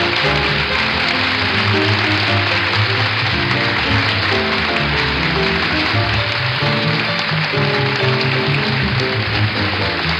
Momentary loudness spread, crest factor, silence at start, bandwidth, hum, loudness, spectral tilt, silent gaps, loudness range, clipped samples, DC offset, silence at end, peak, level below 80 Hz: 2 LU; 14 dB; 0 s; 10 kHz; none; -15 LUFS; -5.5 dB/octave; none; 1 LU; under 0.1%; under 0.1%; 0 s; -2 dBFS; -36 dBFS